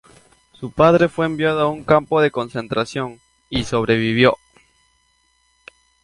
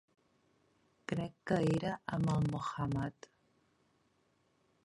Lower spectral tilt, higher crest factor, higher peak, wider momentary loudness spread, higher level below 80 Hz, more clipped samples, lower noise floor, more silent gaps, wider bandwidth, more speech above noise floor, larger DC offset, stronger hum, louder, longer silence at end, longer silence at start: second, -6 dB/octave vs -7.5 dB/octave; about the same, 20 dB vs 20 dB; first, 0 dBFS vs -18 dBFS; first, 13 LU vs 8 LU; first, -48 dBFS vs -62 dBFS; neither; second, -62 dBFS vs -75 dBFS; neither; about the same, 11.5 kHz vs 11.5 kHz; first, 45 dB vs 40 dB; neither; neither; first, -18 LUFS vs -36 LUFS; about the same, 1.7 s vs 1.75 s; second, 0.6 s vs 1.1 s